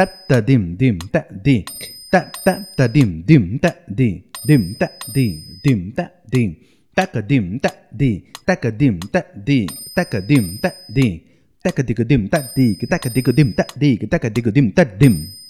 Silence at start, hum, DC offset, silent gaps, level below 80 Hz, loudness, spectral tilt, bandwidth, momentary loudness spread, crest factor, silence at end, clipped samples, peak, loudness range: 0 s; none; 0.1%; none; -42 dBFS; -18 LUFS; -7 dB/octave; 14 kHz; 8 LU; 18 dB; 0 s; under 0.1%; 0 dBFS; 3 LU